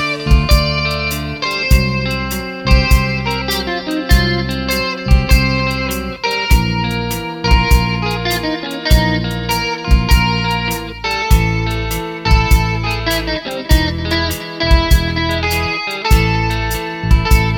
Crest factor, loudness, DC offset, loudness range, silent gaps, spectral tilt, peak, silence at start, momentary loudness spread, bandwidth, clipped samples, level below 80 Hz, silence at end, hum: 14 dB; -15 LUFS; under 0.1%; 1 LU; none; -5 dB/octave; 0 dBFS; 0 s; 7 LU; 19.5 kHz; under 0.1%; -18 dBFS; 0 s; none